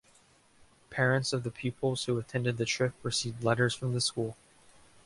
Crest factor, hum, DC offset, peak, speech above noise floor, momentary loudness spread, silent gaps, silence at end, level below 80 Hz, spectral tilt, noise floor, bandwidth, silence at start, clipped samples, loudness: 20 dB; none; under 0.1%; -12 dBFS; 32 dB; 7 LU; none; 0.7 s; -64 dBFS; -4.5 dB/octave; -63 dBFS; 11.5 kHz; 0.9 s; under 0.1%; -31 LUFS